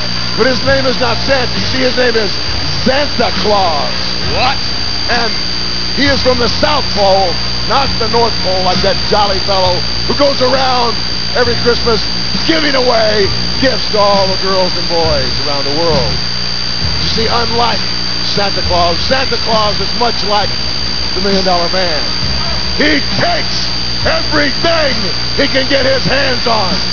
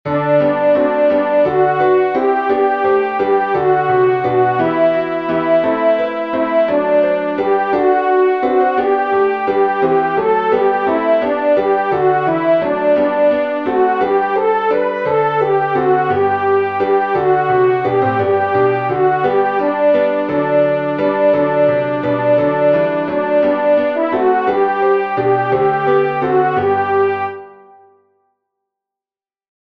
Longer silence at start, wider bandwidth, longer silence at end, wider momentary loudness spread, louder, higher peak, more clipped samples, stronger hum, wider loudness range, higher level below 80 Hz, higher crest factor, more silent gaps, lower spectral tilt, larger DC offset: about the same, 0 s vs 0.05 s; about the same, 5.4 kHz vs 5.2 kHz; second, 0 s vs 2.1 s; about the same, 4 LU vs 3 LU; first, -11 LUFS vs -14 LUFS; about the same, 0 dBFS vs -2 dBFS; first, 0.3% vs under 0.1%; first, 60 Hz at -30 dBFS vs none; about the same, 1 LU vs 1 LU; first, -28 dBFS vs -56 dBFS; about the same, 14 dB vs 12 dB; neither; second, -4 dB/octave vs -8.5 dB/octave; first, 10% vs 0.2%